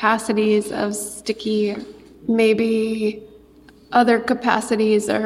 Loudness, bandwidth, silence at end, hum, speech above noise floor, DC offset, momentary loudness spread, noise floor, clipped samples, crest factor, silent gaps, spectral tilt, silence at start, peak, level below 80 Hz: -20 LUFS; 15 kHz; 0 s; none; 29 dB; under 0.1%; 10 LU; -48 dBFS; under 0.1%; 16 dB; none; -4.5 dB/octave; 0 s; -4 dBFS; -56 dBFS